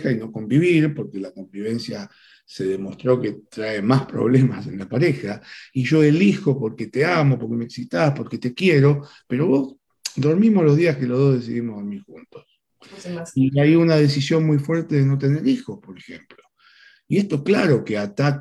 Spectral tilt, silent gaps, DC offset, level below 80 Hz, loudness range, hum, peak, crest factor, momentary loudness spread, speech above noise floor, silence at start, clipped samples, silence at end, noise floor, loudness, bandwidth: -7.5 dB/octave; none; under 0.1%; -62 dBFS; 4 LU; none; -4 dBFS; 16 dB; 16 LU; 33 dB; 0 s; under 0.1%; 0 s; -53 dBFS; -20 LUFS; 11.5 kHz